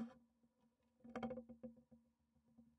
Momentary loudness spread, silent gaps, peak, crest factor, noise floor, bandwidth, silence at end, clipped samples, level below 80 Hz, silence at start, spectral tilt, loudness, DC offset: 17 LU; none; -32 dBFS; 24 dB; -81 dBFS; 8 kHz; 0.05 s; under 0.1%; -82 dBFS; 0 s; -5.5 dB/octave; -53 LUFS; under 0.1%